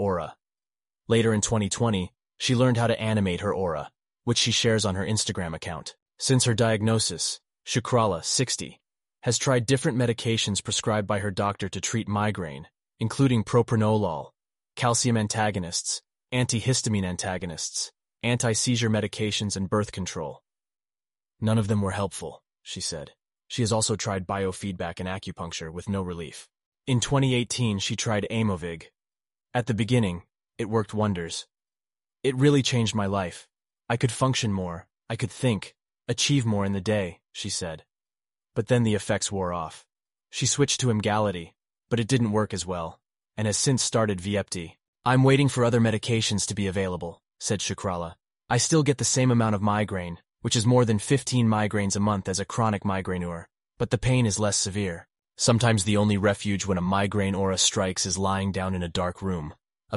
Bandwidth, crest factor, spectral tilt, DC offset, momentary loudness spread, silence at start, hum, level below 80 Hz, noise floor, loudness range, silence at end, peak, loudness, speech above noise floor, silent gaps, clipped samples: 11.5 kHz; 18 dB; -4.5 dB/octave; under 0.1%; 13 LU; 0 s; none; -54 dBFS; under -90 dBFS; 5 LU; 0 s; -8 dBFS; -25 LUFS; over 65 dB; 6.02-6.06 s, 26.66-26.72 s, 44.88-44.93 s; under 0.1%